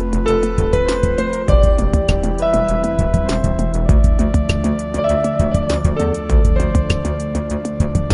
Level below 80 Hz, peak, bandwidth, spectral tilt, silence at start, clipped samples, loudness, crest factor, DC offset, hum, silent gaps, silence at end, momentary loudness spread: -18 dBFS; 0 dBFS; 11 kHz; -7 dB/octave; 0 s; under 0.1%; -17 LUFS; 14 dB; under 0.1%; none; none; 0 s; 5 LU